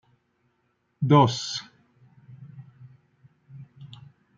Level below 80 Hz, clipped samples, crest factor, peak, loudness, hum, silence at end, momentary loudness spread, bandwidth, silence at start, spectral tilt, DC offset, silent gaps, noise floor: -68 dBFS; under 0.1%; 24 dB; -4 dBFS; -22 LUFS; none; 0.45 s; 29 LU; 7.6 kHz; 1 s; -6 dB/octave; under 0.1%; none; -72 dBFS